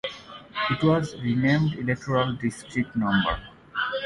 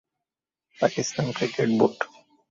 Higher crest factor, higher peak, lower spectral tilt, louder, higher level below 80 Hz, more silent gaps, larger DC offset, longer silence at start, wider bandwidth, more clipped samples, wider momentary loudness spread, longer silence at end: second, 16 dB vs 22 dB; about the same, -8 dBFS vs -6 dBFS; first, -6.5 dB/octave vs -5 dB/octave; about the same, -25 LUFS vs -25 LUFS; first, -48 dBFS vs -64 dBFS; neither; neither; second, 0.05 s vs 0.8 s; first, 11.5 kHz vs 7.8 kHz; neither; first, 12 LU vs 9 LU; second, 0 s vs 0.5 s